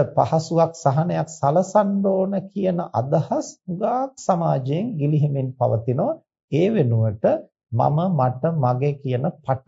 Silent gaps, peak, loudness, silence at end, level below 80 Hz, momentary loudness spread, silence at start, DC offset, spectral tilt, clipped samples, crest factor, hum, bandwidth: 6.44-6.48 s; -4 dBFS; -22 LUFS; 0.1 s; -60 dBFS; 6 LU; 0 s; under 0.1%; -8 dB/octave; under 0.1%; 16 dB; none; 7.8 kHz